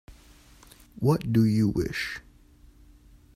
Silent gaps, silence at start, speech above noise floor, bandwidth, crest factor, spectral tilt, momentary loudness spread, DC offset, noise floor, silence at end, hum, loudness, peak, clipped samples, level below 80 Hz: none; 0.1 s; 30 dB; 15 kHz; 18 dB; -7 dB/octave; 11 LU; under 0.1%; -55 dBFS; 1.15 s; none; -26 LUFS; -10 dBFS; under 0.1%; -50 dBFS